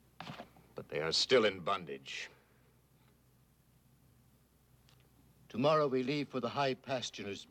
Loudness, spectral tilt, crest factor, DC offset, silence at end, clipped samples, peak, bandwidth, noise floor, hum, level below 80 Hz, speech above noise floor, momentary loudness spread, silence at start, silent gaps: -34 LUFS; -4 dB/octave; 20 dB; under 0.1%; 0.05 s; under 0.1%; -16 dBFS; 15.5 kHz; -68 dBFS; none; -72 dBFS; 34 dB; 20 LU; 0.2 s; none